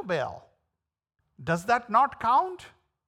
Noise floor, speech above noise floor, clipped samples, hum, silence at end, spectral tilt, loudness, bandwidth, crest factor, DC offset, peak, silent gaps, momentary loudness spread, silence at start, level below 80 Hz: -85 dBFS; 59 dB; under 0.1%; none; 0.4 s; -5.5 dB/octave; -26 LUFS; 16 kHz; 20 dB; under 0.1%; -8 dBFS; none; 14 LU; 0 s; -64 dBFS